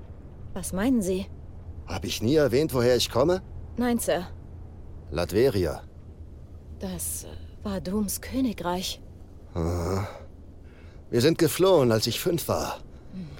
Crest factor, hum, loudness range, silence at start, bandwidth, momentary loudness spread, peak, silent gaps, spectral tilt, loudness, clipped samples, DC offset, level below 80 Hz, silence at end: 18 dB; none; 6 LU; 0 s; 17 kHz; 22 LU; -10 dBFS; none; -5 dB/octave; -26 LUFS; under 0.1%; under 0.1%; -46 dBFS; 0 s